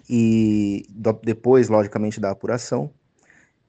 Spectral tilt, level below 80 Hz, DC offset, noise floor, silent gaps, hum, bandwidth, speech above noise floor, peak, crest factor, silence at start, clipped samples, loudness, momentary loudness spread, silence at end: -7.5 dB/octave; -56 dBFS; under 0.1%; -57 dBFS; none; none; 8.6 kHz; 37 dB; -2 dBFS; 18 dB; 0.1 s; under 0.1%; -21 LUFS; 10 LU; 0.8 s